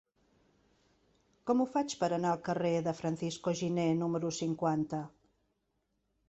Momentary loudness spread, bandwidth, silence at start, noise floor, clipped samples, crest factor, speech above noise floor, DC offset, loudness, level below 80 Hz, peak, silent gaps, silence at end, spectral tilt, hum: 5 LU; 8.2 kHz; 1.45 s; -80 dBFS; under 0.1%; 18 dB; 48 dB; under 0.1%; -33 LUFS; -72 dBFS; -16 dBFS; none; 1.2 s; -6 dB/octave; none